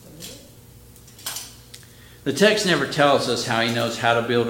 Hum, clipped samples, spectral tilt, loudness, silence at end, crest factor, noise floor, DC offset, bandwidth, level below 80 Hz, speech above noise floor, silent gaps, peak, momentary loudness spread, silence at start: 60 Hz at -50 dBFS; under 0.1%; -4 dB/octave; -20 LUFS; 0 s; 22 dB; -46 dBFS; under 0.1%; 17 kHz; -56 dBFS; 27 dB; none; -2 dBFS; 20 LU; 0.05 s